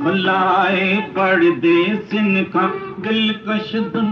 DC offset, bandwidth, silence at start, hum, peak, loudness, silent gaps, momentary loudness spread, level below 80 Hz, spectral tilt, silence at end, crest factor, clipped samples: under 0.1%; 6.4 kHz; 0 s; none; -4 dBFS; -17 LUFS; none; 7 LU; -60 dBFS; -7.5 dB/octave; 0 s; 12 dB; under 0.1%